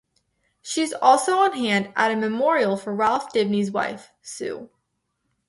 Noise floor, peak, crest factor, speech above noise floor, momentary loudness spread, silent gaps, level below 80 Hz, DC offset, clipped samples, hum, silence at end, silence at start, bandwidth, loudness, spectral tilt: -75 dBFS; -2 dBFS; 20 dB; 53 dB; 15 LU; none; -68 dBFS; under 0.1%; under 0.1%; none; 0.85 s; 0.65 s; 11.5 kHz; -22 LUFS; -4 dB/octave